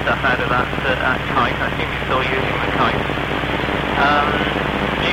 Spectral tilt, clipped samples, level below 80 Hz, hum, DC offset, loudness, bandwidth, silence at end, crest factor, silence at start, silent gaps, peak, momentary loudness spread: -6 dB/octave; under 0.1%; -32 dBFS; none; under 0.1%; -18 LUFS; 16.5 kHz; 0 s; 14 dB; 0 s; none; -4 dBFS; 5 LU